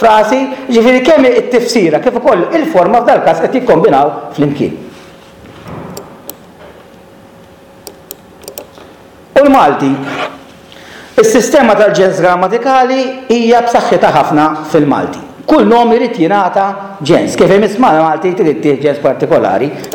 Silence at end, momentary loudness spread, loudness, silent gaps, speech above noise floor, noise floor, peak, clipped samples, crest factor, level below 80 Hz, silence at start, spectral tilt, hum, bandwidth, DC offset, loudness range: 0 s; 19 LU; -9 LUFS; none; 28 dB; -37 dBFS; 0 dBFS; under 0.1%; 10 dB; -46 dBFS; 0 s; -5.5 dB/octave; none; 18 kHz; under 0.1%; 12 LU